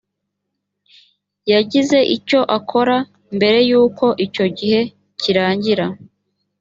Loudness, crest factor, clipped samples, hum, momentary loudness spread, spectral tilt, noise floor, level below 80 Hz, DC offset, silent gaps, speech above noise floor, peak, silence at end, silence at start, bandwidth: -16 LUFS; 16 dB; under 0.1%; 50 Hz at -45 dBFS; 10 LU; -5.5 dB/octave; -76 dBFS; -60 dBFS; under 0.1%; none; 61 dB; -2 dBFS; 0.65 s; 1.45 s; 7.8 kHz